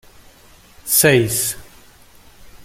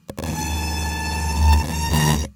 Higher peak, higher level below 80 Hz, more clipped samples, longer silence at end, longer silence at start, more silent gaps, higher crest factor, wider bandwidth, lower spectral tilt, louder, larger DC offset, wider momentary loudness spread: first, 0 dBFS vs -4 dBFS; second, -48 dBFS vs -26 dBFS; neither; about the same, 0 s vs 0.05 s; first, 0.85 s vs 0.1 s; neither; about the same, 20 dB vs 16 dB; about the same, 16.5 kHz vs 18 kHz; about the same, -3.5 dB/octave vs -4.5 dB/octave; first, -15 LUFS vs -21 LUFS; neither; first, 21 LU vs 7 LU